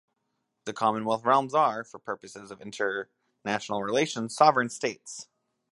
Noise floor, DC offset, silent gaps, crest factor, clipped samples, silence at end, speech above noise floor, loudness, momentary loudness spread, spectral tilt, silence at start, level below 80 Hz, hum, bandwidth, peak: -79 dBFS; under 0.1%; none; 24 dB; under 0.1%; 0.5 s; 52 dB; -27 LUFS; 19 LU; -4 dB/octave; 0.65 s; -76 dBFS; none; 11.5 kHz; -6 dBFS